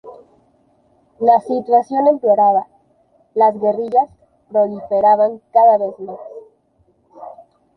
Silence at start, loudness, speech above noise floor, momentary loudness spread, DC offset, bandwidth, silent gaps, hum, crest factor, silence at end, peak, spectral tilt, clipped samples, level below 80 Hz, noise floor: 0.05 s; -16 LUFS; 45 dB; 18 LU; under 0.1%; 6 kHz; none; none; 16 dB; 0.35 s; -2 dBFS; -8 dB/octave; under 0.1%; -66 dBFS; -59 dBFS